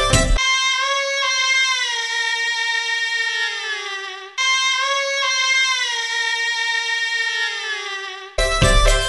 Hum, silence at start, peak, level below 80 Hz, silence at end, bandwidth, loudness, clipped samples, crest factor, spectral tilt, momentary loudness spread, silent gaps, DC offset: none; 0 s; -2 dBFS; -28 dBFS; 0 s; 11.5 kHz; -18 LUFS; under 0.1%; 18 dB; -1.5 dB/octave; 9 LU; none; under 0.1%